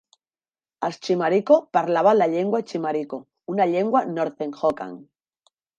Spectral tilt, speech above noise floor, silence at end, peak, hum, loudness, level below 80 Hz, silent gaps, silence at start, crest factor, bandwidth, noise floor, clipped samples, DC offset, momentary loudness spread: -6.5 dB/octave; over 69 dB; 0.75 s; -4 dBFS; none; -22 LUFS; -70 dBFS; none; 0.8 s; 18 dB; 8.8 kHz; under -90 dBFS; under 0.1%; under 0.1%; 12 LU